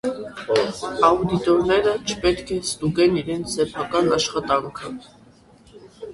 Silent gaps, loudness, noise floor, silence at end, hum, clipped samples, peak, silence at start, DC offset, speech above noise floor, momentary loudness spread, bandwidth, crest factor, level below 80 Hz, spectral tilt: none; -21 LUFS; -51 dBFS; 0 s; none; under 0.1%; -4 dBFS; 0.05 s; under 0.1%; 30 dB; 14 LU; 11.5 kHz; 18 dB; -46 dBFS; -4.5 dB/octave